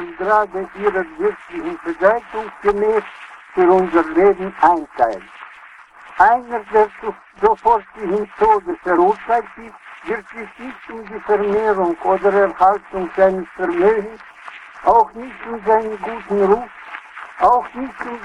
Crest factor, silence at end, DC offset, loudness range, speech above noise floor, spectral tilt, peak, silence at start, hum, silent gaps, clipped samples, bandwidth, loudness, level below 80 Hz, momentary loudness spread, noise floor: 18 dB; 0 s; under 0.1%; 3 LU; 25 dB; -7 dB/octave; 0 dBFS; 0 s; none; none; under 0.1%; 9.8 kHz; -17 LUFS; -48 dBFS; 19 LU; -42 dBFS